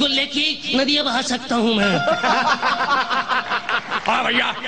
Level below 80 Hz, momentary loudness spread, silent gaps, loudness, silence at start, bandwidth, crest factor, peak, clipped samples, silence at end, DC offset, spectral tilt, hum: -54 dBFS; 4 LU; none; -19 LUFS; 0 s; 9.8 kHz; 14 dB; -4 dBFS; under 0.1%; 0 s; 0.6%; -3 dB/octave; none